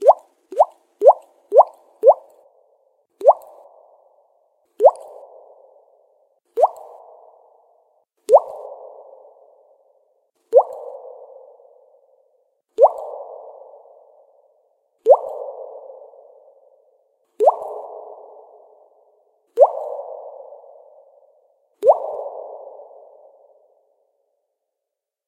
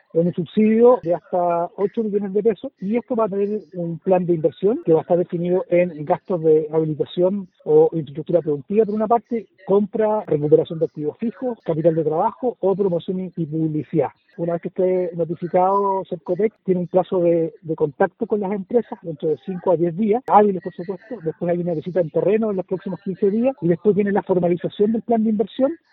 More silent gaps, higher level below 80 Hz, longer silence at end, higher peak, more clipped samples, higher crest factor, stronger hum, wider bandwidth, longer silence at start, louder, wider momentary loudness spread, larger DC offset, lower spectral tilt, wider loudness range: neither; second, -82 dBFS vs -64 dBFS; first, 2.7 s vs 0.15 s; about the same, 0 dBFS vs 0 dBFS; neither; about the same, 22 dB vs 18 dB; neither; first, 11 kHz vs 4.1 kHz; second, 0 s vs 0.15 s; about the same, -18 LUFS vs -20 LUFS; first, 25 LU vs 9 LU; neither; second, -4 dB/octave vs -11.5 dB/octave; first, 7 LU vs 3 LU